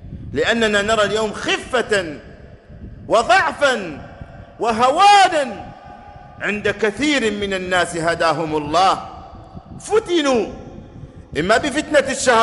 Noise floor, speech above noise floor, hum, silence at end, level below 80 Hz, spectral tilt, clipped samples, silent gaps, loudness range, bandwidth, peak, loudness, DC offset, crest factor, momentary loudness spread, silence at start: -40 dBFS; 23 dB; none; 0 s; -44 dBFS; -3.5 dB/octave; under 0.1%; none; 4 LU; 11.5 kHz; -2 dBFS; -17 LUFS; under 0.1%; 18 dB; 21 LU; 0 s